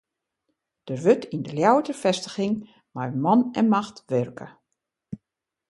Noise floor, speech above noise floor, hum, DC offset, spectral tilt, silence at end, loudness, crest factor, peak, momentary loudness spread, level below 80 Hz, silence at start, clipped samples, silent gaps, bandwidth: -83 dBFS; 60 dB; none; under 0.1%; -6 dB/octave; 0.55 s; -24 LUFS; 22 dB; -4 dBFS; 21 LU; -66 dBFS; 0.85 s; under 0.1%; none; 11.5 kHz